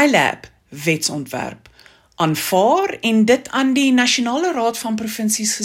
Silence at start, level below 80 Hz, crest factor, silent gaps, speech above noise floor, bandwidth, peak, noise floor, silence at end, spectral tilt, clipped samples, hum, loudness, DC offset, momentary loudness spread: 0 s; -60 dBFS; 18 dB; none; 29 dB; 16.5 kHz; 0 dBFS; -47 dBFS; 0 s; -3.5 dB/octave; under 0.1%; none; -18 LUFS; under 0.1%; 10 LU